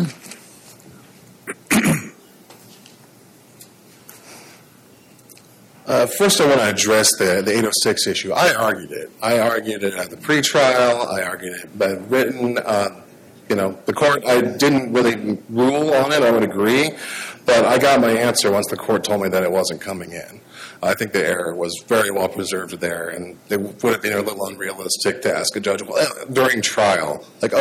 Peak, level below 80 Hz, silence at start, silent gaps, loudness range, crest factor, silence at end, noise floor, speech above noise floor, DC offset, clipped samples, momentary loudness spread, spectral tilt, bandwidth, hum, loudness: -4 dBFS; -58 dBFS; 0 s; none; 7 LU; 16 dB; 0 s; -48 dBFS; 30 dB; under 0.1%; under 0.1%; 13 LU; -3.5 dB/octave; 17 kHz; none; -18 LUFS